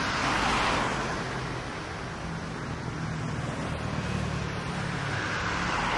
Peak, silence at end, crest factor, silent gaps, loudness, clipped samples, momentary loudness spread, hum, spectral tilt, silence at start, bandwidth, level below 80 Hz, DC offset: -12 dBFS; 0 s; 18 dB; none; -30 LUFS; under 0.1%; 10 LU; none; -4.5 dB/octave; 0 s; 11.5 kHz; -44 dBFS; under 0.1%